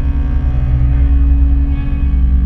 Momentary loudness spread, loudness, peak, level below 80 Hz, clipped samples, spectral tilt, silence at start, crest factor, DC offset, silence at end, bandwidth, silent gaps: 4 LU; -15 LUFS; -2 dBFS; -12 dBFS; under 0.1%; -10.5 dB/octave; 0 s; 10 dB; under 0.1%; 0 s; 3.3 kHz; none